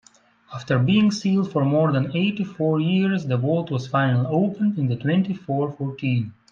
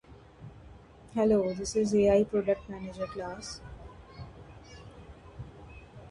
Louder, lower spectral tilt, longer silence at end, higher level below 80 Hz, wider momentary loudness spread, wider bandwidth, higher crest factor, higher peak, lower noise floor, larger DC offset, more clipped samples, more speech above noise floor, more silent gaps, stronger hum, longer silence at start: first, -22 LUFS vs -29 LUFS; first, -7.5 dB/octave vs -6 dB/octave; first, 0.2 s vs 0 s; second, -62 dBFS vs -52 dBFS; second, 6 LU vs 25 LU; second, 7.6 kHz vs 11.5 kHz; second, 14 dB vs 20 dB; first, -6 dBFS vs -12 dBFS; about the same, -52 dBFS vs -52 dBFS; neither; neither; first, 31 dB vs 24 dB; neither; neither; first, 0.5 s vs 0.1 s